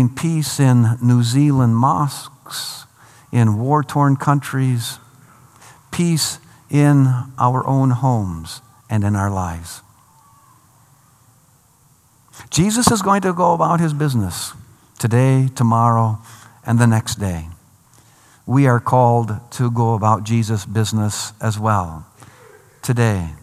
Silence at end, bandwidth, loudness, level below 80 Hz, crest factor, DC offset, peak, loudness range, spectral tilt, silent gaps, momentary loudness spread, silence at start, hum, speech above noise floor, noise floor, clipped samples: 0.05 s; 15 kHz; -17 LUFS; -50 dBFS; 18 dB; under 0.1%; 0 dBFS; 5 LU; -6 dB/octave; none; 15 LU; 0 s; none; 38 dB; -54 dBFS; under 0.1%